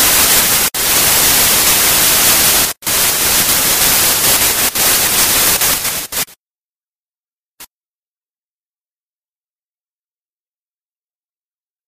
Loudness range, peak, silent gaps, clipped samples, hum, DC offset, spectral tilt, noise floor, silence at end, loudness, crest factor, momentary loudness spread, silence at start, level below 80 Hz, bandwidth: 10 LU; 0 dBFS; 6.41-6.80 s, 6.88-7.06 s, 7.19-7.23 s, 7.32-7.58 s; under 0.1%; none; under 0.1%; 0 dB/octave; under -90 dBFS; 4.2 s; -9 LUFS; 14 dB; 5 LU; 0 s; -38 dBFS; 16 kHz